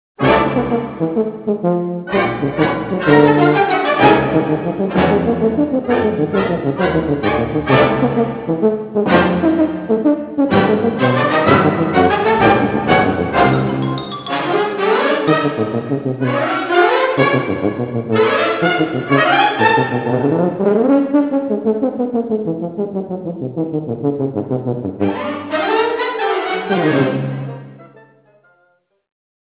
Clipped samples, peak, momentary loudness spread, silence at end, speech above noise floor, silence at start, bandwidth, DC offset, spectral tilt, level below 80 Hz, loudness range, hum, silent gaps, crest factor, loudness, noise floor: under 0.1%; 0 dBFS; 9 LU; 1.65 s; 45 dB; 0.2 s; 4 kHz; under 0.1%; -10.5 dB/octave; -42 dBFS; 6 LU; none; none; 16 dB; -16 LUFS; -59 dBFS